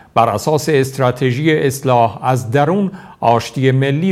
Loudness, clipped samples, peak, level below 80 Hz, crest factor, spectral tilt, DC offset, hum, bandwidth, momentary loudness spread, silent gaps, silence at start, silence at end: -15 LUFS; under 0.1%; 0 dBFS; -52 dBFS; 14 dB; -6 dB/octave; under 0.1%; none; 15 kHz; 3 LU; none; 0.15 s; 0 s